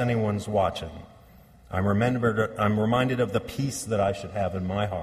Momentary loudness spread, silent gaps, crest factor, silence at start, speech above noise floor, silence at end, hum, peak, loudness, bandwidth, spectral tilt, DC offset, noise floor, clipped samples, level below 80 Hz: 7 LU; none; 18 dB; 0 s; 26 dB; 0 s; none; -10 dBFS; -26 LUFS; 15 kHz; -6.5 dB/octave; under 0.1%; -52 dBFS; under 0.1%; -50 dBFS